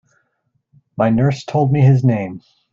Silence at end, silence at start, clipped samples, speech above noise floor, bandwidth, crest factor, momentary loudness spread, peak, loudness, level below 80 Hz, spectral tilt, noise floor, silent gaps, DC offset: 0.35 s; 1 s; under 0.1%; 53 dB; 7.4 kHz; 14 dB; 18 LU; -2 dBFS; -16 LUFS; -52 dBFS; -9 dB/octave; -68 dBFS; none; under 0.1%